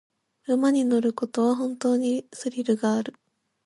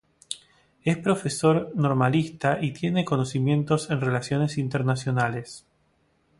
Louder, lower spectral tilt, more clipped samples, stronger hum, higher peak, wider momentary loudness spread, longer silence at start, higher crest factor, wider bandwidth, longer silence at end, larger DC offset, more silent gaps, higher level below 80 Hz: about the same, -25 LUFS vs -25 LUFS; about the same, -5.5 dB/octave vs -6.5 dB/octave; neither; neither; about the same, -10 dBFS vs -8 dBFS; second, 8 LU vs 14 LU; first, 0.5 s vs 0.3 s; about the same, 14 dB vs 18 dB; about the same, 11.5 kHz vs 11.5 kHz; second, 0.55 s vs 0.8 s; neither; neither; second, -76 dBFS vs -60 dBFS